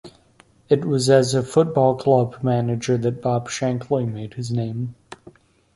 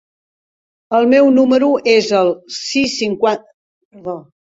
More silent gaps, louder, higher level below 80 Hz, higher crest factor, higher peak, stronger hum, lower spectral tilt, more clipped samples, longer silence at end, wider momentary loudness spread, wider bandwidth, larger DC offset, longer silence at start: second, none vs 3.54-3.91 s; second, -21 LUFS vs -14 LUFS; about the same, -56 dBFS vs -58 dBFS; about the same, 18 dB vs 14 dB; about the same, -2 dBFS vs 0 dBFS; neither; first, -6.5 dB/octave vs -4 dB/octave; neither; first, 0.6 s vs 0.3 s; second, 11 LU vs 17 LU; first, 11.5 kHz vs 8 kHz; neither; second, 0.05 s vs 0.9 s